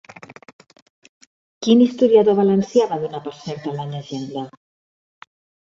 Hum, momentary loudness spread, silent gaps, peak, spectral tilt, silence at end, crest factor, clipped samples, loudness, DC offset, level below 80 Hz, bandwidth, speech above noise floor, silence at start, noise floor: none; 17 LU; 0.53-0.59 s, 0.82-1.02 s, 1.09-1.21 s, 1.27-1.61 s; -2 dBFS; -7 dB/octave; 1.2 s; 18 dB; under 0.1%; -19 LUFS; under 0.1%; -66 dBFS; 7.6 kHz; over 72 dB; 0.3 s; under -90 dBFS